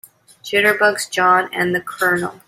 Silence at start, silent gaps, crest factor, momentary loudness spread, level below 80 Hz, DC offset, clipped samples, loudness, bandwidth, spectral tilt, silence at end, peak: 0.45 s; none; 16 dB; 6 LU; -62 dBFS; under 0.1%; under 0.1%; -16 LUFS; 16 kHz; -3.5 dB/octave; 0.15 s; -2 dBFS